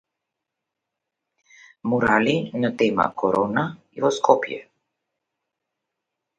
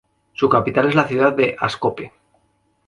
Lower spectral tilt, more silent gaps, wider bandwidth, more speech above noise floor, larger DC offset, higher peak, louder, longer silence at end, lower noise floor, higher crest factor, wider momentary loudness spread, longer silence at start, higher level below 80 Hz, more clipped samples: about the same, -5.5 dB/octave vs -6.5 dB/octave; neither; second, 9.4 kHz vs 11 kHz; first, 62 dB vs 46 dB; neither; about the same, -2 dBFS vs 0 dBFS; second, -22 LUFS vs -18 LUFS; first, 1.75 s vs 0.8 s; first, -83 dBFS vs -64 dBFS; about the same, 22 dB vs 18 dB; second, 12 LU vs 18 LU; first, 1.85 s vs 0.4 s; about the same, -60 dBFS vs -56 dBFS; neither